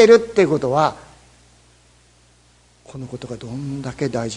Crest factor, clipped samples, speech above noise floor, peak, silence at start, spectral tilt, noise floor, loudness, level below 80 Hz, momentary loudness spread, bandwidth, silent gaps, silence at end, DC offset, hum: 20 dB; under 0.1%; 36 dB; 0 dBFS; 0 s; -5.5 dB/octave; -54 dBFS; -19 LUFS; -52 dBFS; 21 LU; 10.5 kHz; none; 0 s; under 0.1%; 60 Hz at -55 dBFS